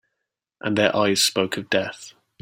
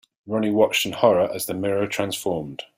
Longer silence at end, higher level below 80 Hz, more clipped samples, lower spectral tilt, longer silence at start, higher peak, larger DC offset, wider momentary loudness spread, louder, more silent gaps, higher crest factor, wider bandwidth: first, 0.3 s vs 0.15 s; about the same, -62 dBFS vs -60 dBFS; neither; about the same, -3 dB/octave vs -4 dB/octave; first, 0.65 s vs 0.25 s; about the same, -2 dBFS vs -2 dBFS; neither; first, 14 LU vs 8 LU; about the same, -21 LUFS vs -22 LUFS; neither; about the same, 22 dB vs 20 dB; about the same, 16.5 kHz vs 16 kHz